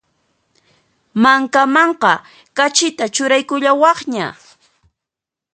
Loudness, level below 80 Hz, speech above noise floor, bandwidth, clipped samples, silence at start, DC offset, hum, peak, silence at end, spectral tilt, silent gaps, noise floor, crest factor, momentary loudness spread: -14 LUFS; -66 dBFS; 71 dB; 9.6 kHz; under 0.1%; 1.15 s; under 0.1%; none; 0 dBFS; 1.2 s; -2.5 dB/octave; none; -86 dBFS; 16 dB; 11 LU